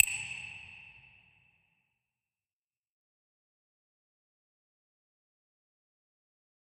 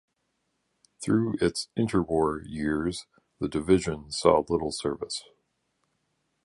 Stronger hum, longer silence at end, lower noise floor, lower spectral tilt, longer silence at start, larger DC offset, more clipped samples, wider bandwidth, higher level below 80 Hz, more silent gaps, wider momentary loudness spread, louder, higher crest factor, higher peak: neither; first, 5.75 s vs 1.2 s; first, under -90 dBFS vs -77 dBFS; second, 1 dB/octave vs -5.5 dB/octave; second, 0 s vs 1 s; neither; neither; first, 14 kHz vs 11.5 kHz; second, -76 dBFS vs -50 dBFS; neither; first, 22 LU vs 11 LU; second, -34 LUFS vs -27 LUFS; first, 40 dB vs 22 dB; first, -2 dBFS vs -6 dBFS